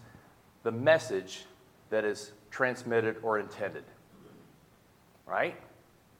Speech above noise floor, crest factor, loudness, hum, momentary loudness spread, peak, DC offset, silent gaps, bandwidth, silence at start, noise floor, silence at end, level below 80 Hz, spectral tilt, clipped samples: 31 dB; 24 dB; -31 LUFS; none; 18 LU; -10 dBFS; under 0.1%; none; 16 kHz; 0 s; -62 dBFS; 0.5 s; -74 dBFS; -5 dB/octave; under 0.1%